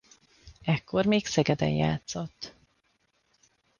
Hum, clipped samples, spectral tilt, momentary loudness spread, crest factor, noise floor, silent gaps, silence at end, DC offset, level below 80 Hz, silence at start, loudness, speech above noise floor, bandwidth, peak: none; under 0.1%; -5.5 dB/octave; 14 LU; 20 dB; -72 dBFS; none; 1.3 s; under 0.1%; -56 dBFS; 0.45 s; -28 LUFS; 45 dB; 9.8 kHz; -10 dBFS